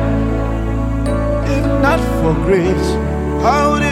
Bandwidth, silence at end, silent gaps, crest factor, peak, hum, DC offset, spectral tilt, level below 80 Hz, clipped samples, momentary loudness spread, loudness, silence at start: 14.5 kHz; 0 s; none; 12 dB; -2 dBFS; none; under 0.1%; -7 dB/octave; -22 dBFS; under 0.1%; 5 LU; -16 LUFS; 0 s